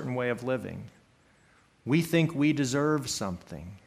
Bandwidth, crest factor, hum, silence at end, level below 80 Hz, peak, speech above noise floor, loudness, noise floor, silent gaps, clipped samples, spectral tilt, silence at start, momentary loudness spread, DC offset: 15.5 kHz; 18 dB; none; 0.1 s; -62 dBFS; -12 dBFS; 34 dB; -28 LUFS; -62 dBFS; none; under 0.1%; -5.5 dB/octave; 0 s; 16 LU; under 0.1%